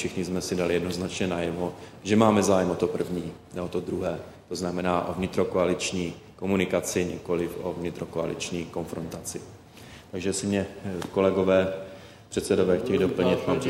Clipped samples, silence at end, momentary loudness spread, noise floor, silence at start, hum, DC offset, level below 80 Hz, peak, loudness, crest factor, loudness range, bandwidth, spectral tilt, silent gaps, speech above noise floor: under 0.1%; 0 s; 14 LU; -47 dBFS; 0 s; none; under 0.1%; -54 dBFS; -6 dBFS; -27 LUFS; 22 dB; 6 LU; 16 kHz; -5.5 dB/octave; none; 21 dB